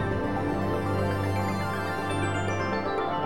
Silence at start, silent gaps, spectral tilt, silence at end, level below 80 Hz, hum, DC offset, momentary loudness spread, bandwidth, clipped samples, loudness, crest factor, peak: 0 s; none; -6.5 dB/octave; 0 s; -48 dBFS; none; 0.7%; 2 LU; 16 kHz; under 0.1%; -28 LUFS; 12 dB; -16 dBFS